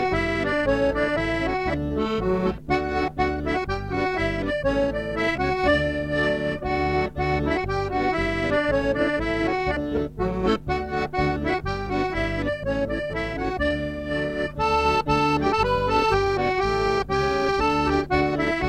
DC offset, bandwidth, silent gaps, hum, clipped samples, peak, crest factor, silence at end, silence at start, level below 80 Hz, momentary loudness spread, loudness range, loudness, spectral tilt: under 0.1%; 13 kHz; none; none; under 0.1%; -8 dBFS; 14 dB; 0 s; 0 s; -36 dBFS; 5 LU; 4 LU; -24 LUFS; -6.5 dB/octave